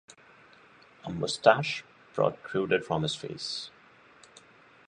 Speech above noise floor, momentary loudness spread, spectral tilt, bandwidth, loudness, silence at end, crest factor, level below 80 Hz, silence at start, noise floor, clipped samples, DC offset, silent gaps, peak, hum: 29 dB; 16 LU; -4.5 dB/octave; 11 kHz; -29 LUFS; 1.2 s; 26 dB; -64 dBFS; 1.05 s; -57 dBFS; under 0.1%; under 0.1%; none; -4 dBFS; none